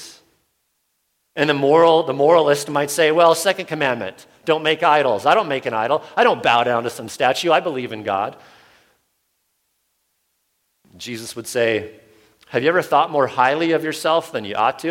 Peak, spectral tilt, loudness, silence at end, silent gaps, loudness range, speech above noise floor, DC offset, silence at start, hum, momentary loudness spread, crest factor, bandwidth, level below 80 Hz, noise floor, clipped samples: -2 dBFS; -4 dB/octave; -18 LUFS; 0 s; none; 11 LU; 52 dB; under 0.1%; 0 s; none; 13 LU; 18 dB; 16.5 kHz; -66 dBFS; -70 dBFS; under 0.1%